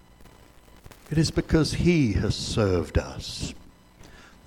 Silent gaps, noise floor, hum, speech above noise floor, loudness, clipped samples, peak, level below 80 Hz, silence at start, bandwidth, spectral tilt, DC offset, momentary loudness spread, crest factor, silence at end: none; -52 dBFS; none; 28 dB; -25 LUFS; under 0.1%; -8 dBFS; -38 dBFS; 0.85 s; 16 kHz; -6 dB/octave; under 0.1%; 12 LU; 20 dB; 0.25 s